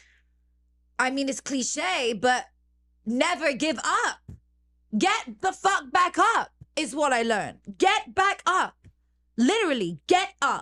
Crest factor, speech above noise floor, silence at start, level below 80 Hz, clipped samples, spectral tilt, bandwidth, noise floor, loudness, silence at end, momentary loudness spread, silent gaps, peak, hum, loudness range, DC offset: 18 dB; 40 dB; 1 s; -62 dBFS; under 0.1%; -2.5 dB/octave; 12.5 kHz; -65 dBFS; -25 LUFS; 0 s; 9 LU; none; -8 dBFS; 60 Hz at -60 dBFS; 3 LU; under 0.1%